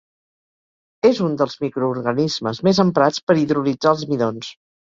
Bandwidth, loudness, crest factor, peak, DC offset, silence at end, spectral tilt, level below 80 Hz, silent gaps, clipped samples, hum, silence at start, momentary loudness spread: 7.6 kHz; -19 LUFS; 18 dB; -2 dBFS; under 0.1%; 0.35 s; -6 dB/octave; -58 dBFS; 3.23-3.27 s; under 0.1%; none; 1.05 s; 6 LU